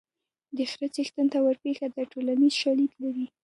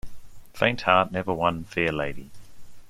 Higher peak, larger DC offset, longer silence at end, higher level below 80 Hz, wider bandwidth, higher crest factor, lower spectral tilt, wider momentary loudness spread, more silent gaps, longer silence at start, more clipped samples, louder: second, -14 dBFS vs -4 dBFS; neither; first, 0.15 s vs 0 s; second, -80 dBFS vs -50 dBFS; second, 11.5 kHz vs 16 kHz; second, 14 dB vs 22 dB; second, -3.5 dB/octave vs -6 dB/octave; about the same, 10 LU vs 10 LU; neither; first, 0.55 s vs 0.05 s; neither; second, -27 LUFS vs -24 LUFS